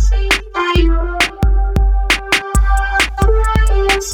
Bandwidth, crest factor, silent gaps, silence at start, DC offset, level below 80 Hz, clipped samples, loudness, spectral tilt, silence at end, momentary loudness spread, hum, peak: 15 kHz; 10 dB; none; 0 s; under 0.1%; -14 dBFS; under 0.1%; -15 LUFS; -4 dB/octave; 0 s; 2 LU; none; -2 dBFS